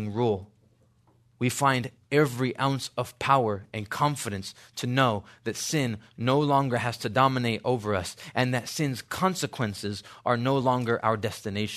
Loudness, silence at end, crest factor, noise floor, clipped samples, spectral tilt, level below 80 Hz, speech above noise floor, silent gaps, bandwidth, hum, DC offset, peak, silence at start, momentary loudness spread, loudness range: -27 LUFS; 0 s; 20 dB; -63 dBFS; under 0.1%; -5 dB/octave; -64 dBFS; 36 dB; none; 13.5 kHz; none; under 0.1%; -6 dBFS; 0 s; 9 LU; 2 LU